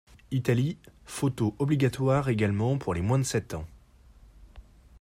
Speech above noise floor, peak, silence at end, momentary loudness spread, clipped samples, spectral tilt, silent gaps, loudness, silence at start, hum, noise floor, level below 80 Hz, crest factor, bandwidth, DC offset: 28 dB; -10 dBFS; 0.4 s; 14 LU; under 0.1%; -6.5 dB/octave; none; -28 LUFS; 0.3 s; none; -55 dBFS; -52 dBFS; 18 dB; 15.5 kHz; under 0.1%